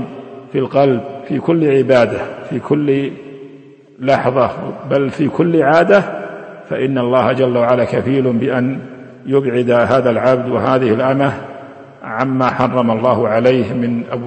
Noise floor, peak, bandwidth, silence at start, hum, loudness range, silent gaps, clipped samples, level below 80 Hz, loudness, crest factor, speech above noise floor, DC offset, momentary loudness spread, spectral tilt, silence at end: -40 dBFS; 0 dBFS; 8.6 kHz; 0 s; none; 2 LU; none; under 0.1%; -54 dBFS; -15 LUFS; 14 dB; 26 dB; under 0.1%; 15 LU; -8 dB/octave; 0 s